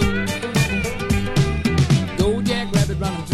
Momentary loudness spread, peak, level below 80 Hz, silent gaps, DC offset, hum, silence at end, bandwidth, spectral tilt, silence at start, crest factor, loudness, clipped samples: 4 LU; -4 dBFS; -30 dBFS; none; under 0.1%; none; 0 s; 15 kHz; -5.5 dB/octave; 0 s; 16 dB; -20 LUFS; under 0.1%